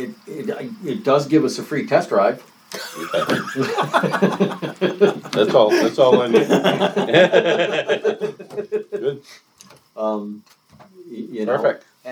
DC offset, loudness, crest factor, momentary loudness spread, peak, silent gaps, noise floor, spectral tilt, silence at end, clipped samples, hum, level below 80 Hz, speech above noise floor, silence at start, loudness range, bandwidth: under 0.1%; -19 LUFS; 18 dB; 17 LU; 0 dBFS; none; -49 dBFS; -5.5 dB/octave; 0 s; under 0.1%; none; -70 dBFS; 31 dB; 0 s; 10 LU; over 20 kHz